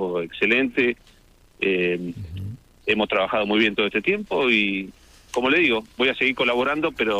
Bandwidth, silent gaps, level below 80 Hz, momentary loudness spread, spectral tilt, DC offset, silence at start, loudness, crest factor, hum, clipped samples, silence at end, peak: 14.5 kHz; none; -54 dBFS; 13 LU; -5.5 dB/octave; under 0.1%; 0 s; -21 LUFS; 18 dB; none; under 0.1%; 0 s; -4 dBFS